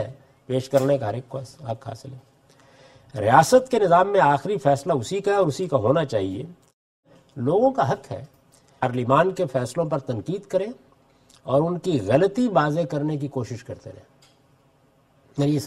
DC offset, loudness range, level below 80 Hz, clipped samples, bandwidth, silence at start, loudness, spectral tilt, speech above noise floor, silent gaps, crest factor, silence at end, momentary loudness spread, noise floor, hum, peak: under 0.1%; 6 LU; -60 dBFS; under 0.1%; 15.5 kHz; 0 s; -22 LUFS; -6.5 dB/octave; 38 dB; 6.73-7.03 s; 22 dB; 0 s; 18 LU; -60 dBFS; none; 0 dBFS